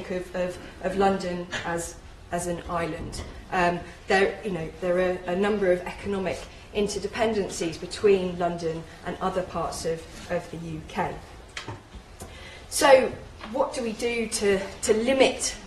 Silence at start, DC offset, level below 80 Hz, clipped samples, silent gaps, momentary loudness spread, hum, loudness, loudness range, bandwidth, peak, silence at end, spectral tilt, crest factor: 0 s; under 0.1%; -46 dBFS; under 0.1%; none; 15 LU; none; -26 LUFS; 7 LU; 13 kHz; -4 dBFS; 0 s; -4 dB/octave; 22 dB